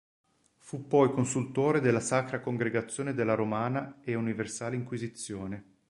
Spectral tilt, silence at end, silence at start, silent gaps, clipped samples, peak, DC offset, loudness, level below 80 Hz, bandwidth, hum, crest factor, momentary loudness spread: -6 dB/octave; 0.25 s; 0.65 s; none; under 0.1%; -10 dBFS; under 0.1%; -30 LUFS; -66 dBFS; 11.5 kHz; none; 20 dB; 12 LU